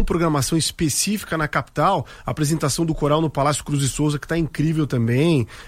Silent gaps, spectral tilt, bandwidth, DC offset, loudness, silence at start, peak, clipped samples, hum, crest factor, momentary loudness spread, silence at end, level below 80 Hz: none; -5 dB/octave; 16 kHz; under 0.1%; -21 LUFS; 0 s; -6 dBFS; under 0.1%; none; 14 dB; 4 LU; 0 s; -36 dBFS